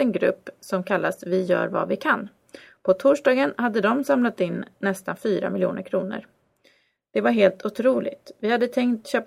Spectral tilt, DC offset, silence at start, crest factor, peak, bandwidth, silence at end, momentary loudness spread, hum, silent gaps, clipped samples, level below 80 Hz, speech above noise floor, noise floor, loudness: -6 dB/octave; under 0.1%; 0 s; 20 dB; -4 dBFS; 15 kHz; 0 s; 10 LU; none; none; under 0.1%; -70 dBFS; 39 dB; -62 dBFS; -23 LUFS